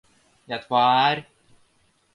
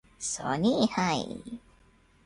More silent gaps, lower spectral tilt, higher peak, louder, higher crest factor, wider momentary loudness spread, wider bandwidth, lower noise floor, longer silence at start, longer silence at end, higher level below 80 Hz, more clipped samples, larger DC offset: neither; about the same, -5.5 dB/octave vs -4.5 dB/octave; first, -6 dBFS vs -10 dBFS; first, -22 LUFS vs -28 LUFS; about the same, 18 dB vs 20 dB; about the same, 16 LU vs 18 LU; about the same, 11 kHz vs 11.5 kHz; about the same, -64 dBFS vs -61 dBFS; first, 0.5 s vs 0.2 s; first, 0.9 s vs 0.65 s; second, -68 dBFS vs -60 dBFS; neither; neither